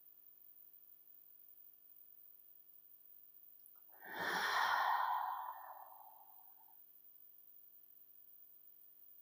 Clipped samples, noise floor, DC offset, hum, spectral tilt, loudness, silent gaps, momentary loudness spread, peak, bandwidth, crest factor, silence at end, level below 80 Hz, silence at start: under 0.1%; -63 dBFS; under 0.1%; 50 Hz at -90 dBFS; -1 dB/octave; -39 LUFS; none; 23 LU; -24 dBFS; 15.5 kHz; 22 dB; 0 s; under -90 dBFS; 0.05 s